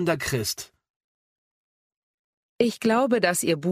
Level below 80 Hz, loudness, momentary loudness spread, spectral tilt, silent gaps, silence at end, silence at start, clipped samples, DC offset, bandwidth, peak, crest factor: -58 dBFS; -24 LUFS; 10 LU; -4 dB/octave; 0.90-1.90 s, 1.96-2.59 s; 0 s; 0 s; under 0.1%; under 0.1%; 15.5 kHz; -6 dBFS; 20 dB